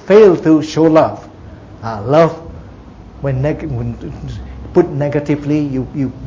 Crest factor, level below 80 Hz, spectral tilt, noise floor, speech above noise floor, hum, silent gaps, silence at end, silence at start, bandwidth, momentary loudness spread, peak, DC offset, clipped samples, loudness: 14 dB; -36 dBFS; -8 dB/octave; -35 dBFS; 22 dB; none; none; 0 s; 0.05 s; 7.6 kHz; 19 LU; 0 dBFS; under 0.1%; under 0.1%; -14 LUFS